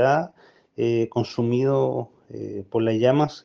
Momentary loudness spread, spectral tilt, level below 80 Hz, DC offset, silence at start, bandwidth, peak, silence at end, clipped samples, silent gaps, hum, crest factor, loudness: 16 LU; -7.5 dB/octave; -66 dBFS; under 0.1%; 0 s; 7 kHz; -6 dBFS; 0.05 s; under 0.1%; none; none; 16 dB; -23 LUFS